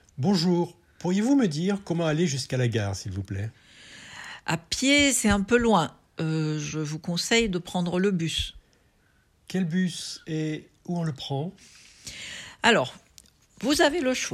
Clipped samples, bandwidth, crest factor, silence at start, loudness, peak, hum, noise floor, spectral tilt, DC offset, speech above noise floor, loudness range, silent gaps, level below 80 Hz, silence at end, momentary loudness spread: under 0.1%; 14.5 kHz; 22 dB; 0.15 s; -26 LUFS; -4 dBFS; none; -64 dBFS; -4.5 dB/octave; under 0.1%; 39 dB; 7 LU; none; -50 dBFS; 0 s; 15 LU